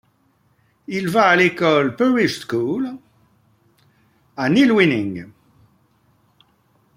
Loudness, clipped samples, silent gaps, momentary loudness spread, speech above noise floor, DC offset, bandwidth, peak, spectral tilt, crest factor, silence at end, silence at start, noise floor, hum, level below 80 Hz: -18 LUFS; under 0.1%; none; 15 LU; 44 dB; under 0.1%; 16 kHz; -2 dBFS; -6 dB/octave; 18 dB; 1.65 s; 0.9 s; -61 dBFS; none; -62 dBFS